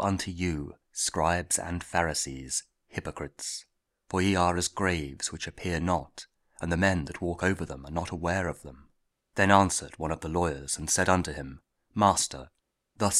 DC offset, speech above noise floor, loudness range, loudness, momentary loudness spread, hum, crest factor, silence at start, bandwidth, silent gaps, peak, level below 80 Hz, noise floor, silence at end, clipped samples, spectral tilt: under 0.1%; 41 dB; 4 LU; -29 LUFS; 14 LU; none; 26 dB; 0 s; 15.5 kHz; none; -4 dBFS; -48 dBFS; -70 dBFS; 0 s; under 0.1%; -4 dB/octave